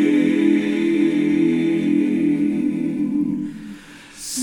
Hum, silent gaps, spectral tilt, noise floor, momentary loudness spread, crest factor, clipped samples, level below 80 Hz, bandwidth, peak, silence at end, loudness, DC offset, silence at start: none; none; -5.5 dB/octave; -40 dBFS; 14 LU; 12 dB; under 0.1%; -58 dBFS; 15.5 kHz; -6 dBFS; 0 s; -19 LUFS; under 0.1%; 0 s